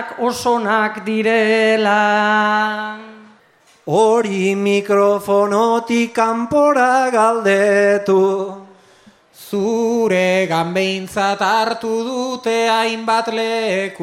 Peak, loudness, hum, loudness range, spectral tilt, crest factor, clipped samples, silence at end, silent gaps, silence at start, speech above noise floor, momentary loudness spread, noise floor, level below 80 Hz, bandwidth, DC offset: -2 dBFS; -16 LUFS; none; 3 LU; -4.5 dB/octave; 14 dB; under 0.1%; 0 s; none; 0 s; 37 dB; 7 LU; -52 dBFS; -62 dBFS; 15.5 kHz; under 0.1%